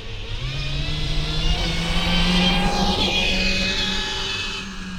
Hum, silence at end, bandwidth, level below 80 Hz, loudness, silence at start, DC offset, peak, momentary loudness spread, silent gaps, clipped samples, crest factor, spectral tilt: none; 0 s; 14.5 kHz; -26 dBFS; -21 LUFS; 0 s; under 0.1%; -6 dBFS; 9 LU; none; under 0.1%; 16 dB; -4 dB/octave